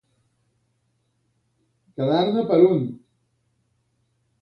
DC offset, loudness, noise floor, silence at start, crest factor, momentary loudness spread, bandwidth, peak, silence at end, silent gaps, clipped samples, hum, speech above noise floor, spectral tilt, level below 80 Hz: under 0.1%; -20 LUFS; -70 dBFS; 2 s; 20 dB; 14 LU; 5.6 kHz; -4 dBFS; 1.45 s; none; under 0.1%; none; 51 dB; -9.5 dB/octave; -68 dBFS